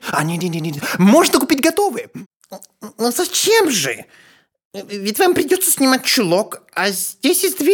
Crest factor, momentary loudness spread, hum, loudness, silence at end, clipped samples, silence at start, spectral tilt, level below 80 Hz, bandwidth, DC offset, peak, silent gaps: 16 dB; 15 LU; none; -16 LUFS; 0 s; under 0.1%; 0 s; -3.5 dB/octave; -60 dBFS; 20 kHz; under 0.1%; 0 dBFS; 2.26-2.40 s, 4.65-4.71 s